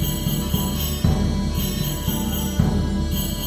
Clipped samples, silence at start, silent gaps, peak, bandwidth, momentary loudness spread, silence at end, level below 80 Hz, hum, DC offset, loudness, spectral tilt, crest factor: under 0.1%; 0 s; none; -4 dBFS; over 20 kHz; 3 LU; 0 s; -28 dBFS; none; under 0.1%; -23 LUFS; -5 dB/octave; 18 dB